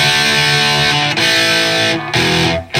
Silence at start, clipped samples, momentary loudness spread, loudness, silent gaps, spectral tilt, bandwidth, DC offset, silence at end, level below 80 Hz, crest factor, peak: 0 s; under 0.1%; 4 LU; -11 LUFS; none; -2.5 dB/octave; 16.5 kHz; under 0.1%; 0 s; -44 dBFS; 12 dB; 0 dBFS